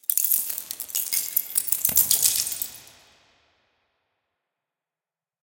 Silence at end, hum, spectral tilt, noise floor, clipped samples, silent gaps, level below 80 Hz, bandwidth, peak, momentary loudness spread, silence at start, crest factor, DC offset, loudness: 2.55 s; none; 1.5 dB/octave; under -90 dBFS; under 0.1%; none; -66 dBFS; 18 kHz; 0 dBFS; 12 LU; 0.1 s; 26 dB; under 0.1%; -21 LUFS